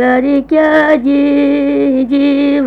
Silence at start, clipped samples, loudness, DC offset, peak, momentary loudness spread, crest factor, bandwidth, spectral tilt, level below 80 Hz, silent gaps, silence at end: 0 s; under 0.1%; -11 LUFS; under 0.1%; 0 dBFS; 3 LU; 10 dB; 4.9 kHz; -6.5 dB/octave; -42 dBFS; none; 0 s